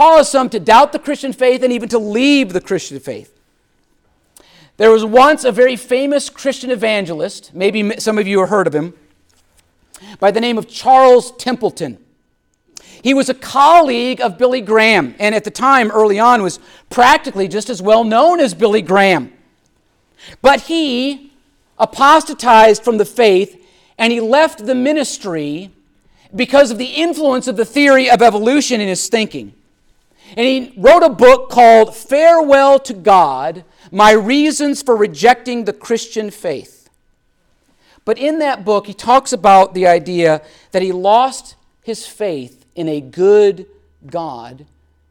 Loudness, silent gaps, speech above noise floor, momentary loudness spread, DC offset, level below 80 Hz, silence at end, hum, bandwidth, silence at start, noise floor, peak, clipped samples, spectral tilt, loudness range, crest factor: -12 LUFS; none; 50 dB; 15 LU; under 0.1%; -50 dBFS; 0.6 s; none; 17.5 kHz; 0 s; -62 dBFS; 0 dBFS; under 0.1%; -4 dB/octave; 7 LU; 12 dB